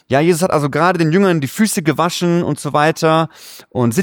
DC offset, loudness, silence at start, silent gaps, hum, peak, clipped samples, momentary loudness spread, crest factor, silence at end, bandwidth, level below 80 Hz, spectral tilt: under 0.1%; -15 LUFS; 0.1 s; none; none; -2 dBFS; under 0.1%; 5 LU; 14 dB; 0 s; 20 kHz; -54 dBFS; -5.5 dB/octave